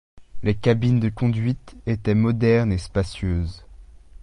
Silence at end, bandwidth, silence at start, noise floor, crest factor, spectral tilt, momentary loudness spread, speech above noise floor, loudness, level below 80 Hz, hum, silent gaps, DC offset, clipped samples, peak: 0.4 s; 10.5 kHz; 0.15 s; -44 dBFS; 18 dB; -8 dB/octave; 9 LU; 23 dB; -22 LUFS; -36 dBFS; none; none; under 0.1%; under 0.1%; -4 dBFS